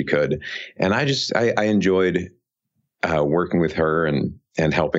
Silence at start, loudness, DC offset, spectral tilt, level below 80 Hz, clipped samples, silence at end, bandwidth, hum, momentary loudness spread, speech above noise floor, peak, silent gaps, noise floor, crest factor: 0 s; -21 LUFS; under 0.1%; -6 dB/octave; -48 dBFS; under 0.1%; 0 s; 8 kHz; none; 8 LU; 54 dB; -4 dBFS; none; -74 dBFS; 18 dB